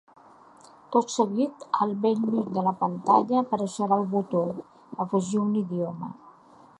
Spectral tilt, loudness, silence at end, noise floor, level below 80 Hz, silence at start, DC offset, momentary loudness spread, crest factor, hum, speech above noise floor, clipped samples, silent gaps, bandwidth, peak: -7 dB/octave; -26 LUFS; 0.5 s; -53 dBFS; -74 dBFS; 0.9 s; under 0.1%; 10 LU; 20 dB; none; 28 dB; under 0.1%; none; 11 kHz; -6 dBFS